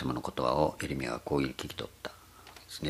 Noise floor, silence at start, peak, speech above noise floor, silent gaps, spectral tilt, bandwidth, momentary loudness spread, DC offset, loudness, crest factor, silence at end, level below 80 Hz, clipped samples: -53 dBFS; 0 s; -12 dBFS; 20 dB; none; -5.5 dB/octave; 15.5 kHz; 19 LU; under 0.1%; -33 LUFS; 22 dB; 0 s; -52 dBFS; under 0.1%